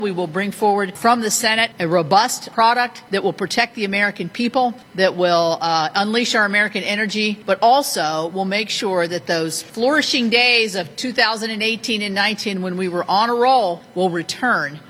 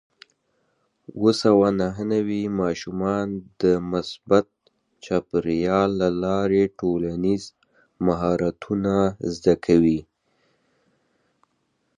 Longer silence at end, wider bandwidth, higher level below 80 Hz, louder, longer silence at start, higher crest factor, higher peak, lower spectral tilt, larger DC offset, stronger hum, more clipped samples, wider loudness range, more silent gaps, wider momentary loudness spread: second, 0.1 s vs 1.95 s; first, 16.5 kHz vs 11 kHz; second, -64 dBFS vs -50 dBFS; first, -18 LUFS vs -22 LUFS; second, 0 s vs 1.15 s; about the same, 18 dB vs 20 dB; about the same, 0 dBFS vs -2 dBFS; second, -3 dB/octave vs -7 dB/octave; neither; neither; neither; about the same, 2 LU vs 2 LU; neither; about the same, 7 LU vs 8 LU